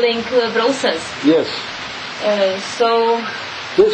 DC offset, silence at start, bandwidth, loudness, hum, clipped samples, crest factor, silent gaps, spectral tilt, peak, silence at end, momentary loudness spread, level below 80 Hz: under 0.1%; 0 s; 9 kHz; -17 LUFS; none; under 0.1%; 16 dB; none; -3.5 dB/octave; -2 dBFS; 0 s; 10 LU; -54 dBFS